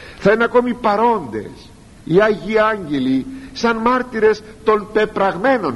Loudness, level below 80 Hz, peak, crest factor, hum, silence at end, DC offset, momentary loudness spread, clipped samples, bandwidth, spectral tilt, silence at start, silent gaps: -17 LUFS; -44 dBFS; -2 dBFS; 14 dB; none; 0 s; under 0.1%; 7 LU; under 0.1%; 11.5 kHz; -6 dB/octave; 0 s; none